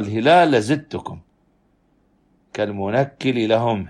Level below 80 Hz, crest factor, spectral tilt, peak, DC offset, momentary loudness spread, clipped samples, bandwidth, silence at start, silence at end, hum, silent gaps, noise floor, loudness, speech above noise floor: -58 dBFS; 18 dB; -6 dB/octave; -2 dBFS; under 0.1%; 19 LU; under 0.1%; 10.5 kHz; 0 s; 0 s; none; none; -61 dBFS; -18 LUFS; 43 dB